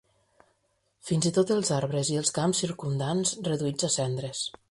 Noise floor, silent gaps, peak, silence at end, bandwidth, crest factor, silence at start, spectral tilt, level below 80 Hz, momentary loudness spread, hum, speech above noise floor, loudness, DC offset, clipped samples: -73 dBFS; none; -10 dBFS; 0.2 s; 11.5 kHz; 18 dB; 1.05 s; -4.5 dB/octave; -64 dBFS; 6 LU; none; 45 dB; -27 LUFS; under 0.1%; under 0.1%